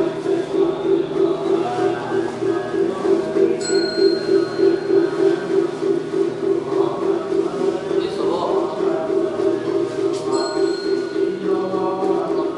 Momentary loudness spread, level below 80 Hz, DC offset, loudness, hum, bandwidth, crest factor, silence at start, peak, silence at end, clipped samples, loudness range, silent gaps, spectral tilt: 4 LU; -60 dBFS; under 0.1%; -20 LUFS; none; 11 kHz; 14 dB; 0 s; -4 dBFS; 0 s; under 0.1%; 2 LU; none; -5.5 dB/octave